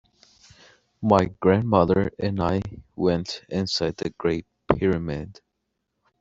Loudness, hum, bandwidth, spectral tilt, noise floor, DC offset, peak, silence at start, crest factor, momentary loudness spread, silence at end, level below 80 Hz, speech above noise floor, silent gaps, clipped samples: -24 LUFS; none; 7.8 kHz; -6.5 dB/octave; -78 dBFS; under 0.1%; 0 dBFS; 1 s; 24 dB; 11 LU; 0.9 s; -48 dBFS; 55 dB; none; under 0.1%